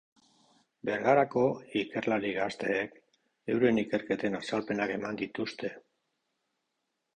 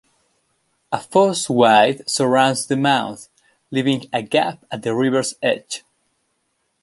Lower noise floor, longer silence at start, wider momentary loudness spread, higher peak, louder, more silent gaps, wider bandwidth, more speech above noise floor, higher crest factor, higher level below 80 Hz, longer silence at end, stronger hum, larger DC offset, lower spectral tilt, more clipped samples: first, -83 dBFS vs -70 dBFS; about the same, 0.85 s vs 0.9 s; about the same, 11 LU vs 13 LU; second, -12 dBFS vs -2 dBFS; second, -31 LUFS vs -18 LUFS; neither; second, 9.8 kHz vs 12 kHz; about the same, 53 dB vs 52 dB; about the same, 20 dB vs 18 dB; about the same, -68 dBFS vs -66 dBFS; first, 1.35 s vs 1.05 s; neither; neither; first, -6 dB/octave vs -4 dB/octave; neither